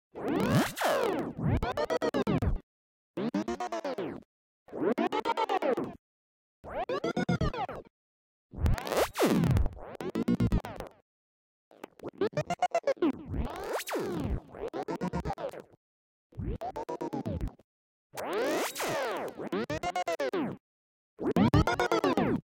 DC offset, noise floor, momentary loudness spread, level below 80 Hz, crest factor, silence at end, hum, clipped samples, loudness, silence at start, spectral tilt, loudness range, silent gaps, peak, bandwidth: under 0.1%; under -90 dBFS; 14 LU; -42 dBFS; 20 dB; 0.1 s; none; under 0.1%; -32 LUFS; 0.15 s; -6 dB/octave; 6 LU; 2.63-3.14 s, 4.25-4.66 s, 5.99-6.64 s, 7.90-8.49 s, 11.02-11.71 s, 15.77-16.30 s, 17.64-18.10 s, 20.60-21.17 s; -12 dBFS; 17 kHz